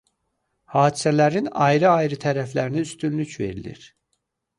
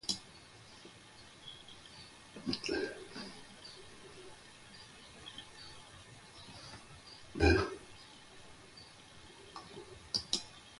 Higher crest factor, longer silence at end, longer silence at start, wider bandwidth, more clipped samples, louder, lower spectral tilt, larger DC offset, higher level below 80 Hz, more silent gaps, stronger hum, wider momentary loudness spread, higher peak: second, 18 dB vs 26 dB; first, 0.7 s vs 0 s; first, 0.7 s vs 0.05 s; about the same, 11.5 kHz vs 11.5 kHz; neither; first, -21 LUFS vs -39 LUFS; first, -6 dB/octave vs -4 dB/octave; neither; second, -56 dBFS vs -50 dBFS; neither; neither; second, 12 LU vs 19 LU; first, -4 dBFS vs -16 dBFS